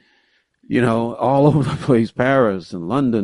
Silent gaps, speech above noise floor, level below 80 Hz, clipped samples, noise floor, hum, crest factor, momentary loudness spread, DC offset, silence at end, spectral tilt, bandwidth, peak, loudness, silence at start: none; 45 dB; -50 dBFS; under 0.1%; -62 dBFS; none; 16 dB; 7 LU; under 0.1%; 0 s; -8 dB/octave; 11.5 kHz; -2 dBFS; -18 LUFS; 0.7 s